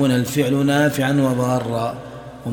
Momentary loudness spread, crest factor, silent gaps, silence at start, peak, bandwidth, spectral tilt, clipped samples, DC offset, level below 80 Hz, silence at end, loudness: 14 LU; 16 dB; none; 0 s; -4 dBFS; 18 kHz; -6 dB/octave; under 0.1%; under 0.1%; -52 dBFS; 0 s; -19 LUFS